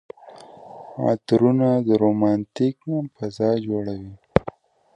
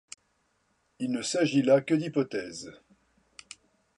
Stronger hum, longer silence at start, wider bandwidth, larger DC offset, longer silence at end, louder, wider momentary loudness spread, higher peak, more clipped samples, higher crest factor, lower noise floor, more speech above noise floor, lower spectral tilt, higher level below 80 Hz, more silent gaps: neither; second, 0.25 s vs 1 s; about the same, 10 kHz vs 11 kHz; neither; second, 0.55 s vs 1.25 s; first, -22 LUFS vs -27 LUFS; second, 19 LU vs 25 LU; first, 0 dBFS vs -10 dBFS; neither; about the same, 22 dB vs 20 dB; second, -44 dBFS vs -73 dBFS; second, 24 dB vs 46 dB; first, -8.5 dB/octave vs -5 dB/octave; first, -50 dBFS vs -72 dBFS; neither